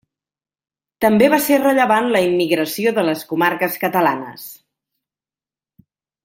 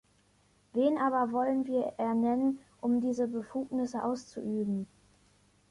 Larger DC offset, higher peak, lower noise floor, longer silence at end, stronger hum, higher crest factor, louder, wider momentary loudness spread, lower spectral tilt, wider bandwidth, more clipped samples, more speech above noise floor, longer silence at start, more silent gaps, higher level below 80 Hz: neither; first, -2 dBFS vs -16 dBFS; first, under -90 dBFS vs -67 dBFS; first, 1.7 s vs 0.85 s; second, none vs 50 Hz at -60 dBFS; about the same, 18 dB vs 16 dB; first, -16 LUFS vs -32 LUFS; about the same, 9 LU vs 8 LU; second, -4.5 dB/octave vs -7 dB/octave; first, 16.5 kHz vs 11 kHz; neither; first, over 74 dB vs 37 dB; first, 1 s vs 0.75 s; neither; first, -60 dBFS vs -70 dBFS